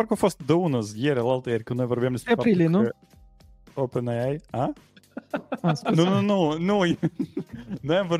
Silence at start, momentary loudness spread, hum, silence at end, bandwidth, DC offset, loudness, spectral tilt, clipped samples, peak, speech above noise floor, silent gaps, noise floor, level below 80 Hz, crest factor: 0 s; 13 LU; none; 0 s; 15 kHz; under 0.1%; -25 LUFS; -7 dB/octave; under 0.1%; -6 dBFS; 28 dB; none; -52 dBFS; -58 dBFS; 18 dB